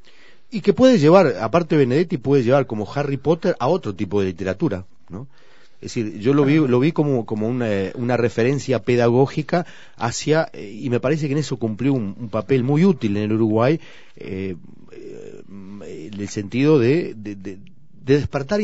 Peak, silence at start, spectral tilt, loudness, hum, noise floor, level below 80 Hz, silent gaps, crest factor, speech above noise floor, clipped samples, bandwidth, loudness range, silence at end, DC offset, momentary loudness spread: 0 dBFS; 0.55 s; -7 dB/octave; -19 LUFS; none; -52 dBFS; -52 dBFS; none; 20 dB; 33 dB; under 0.1%; 8 kHz; 6 LU; 0 s; 1%; 20 LU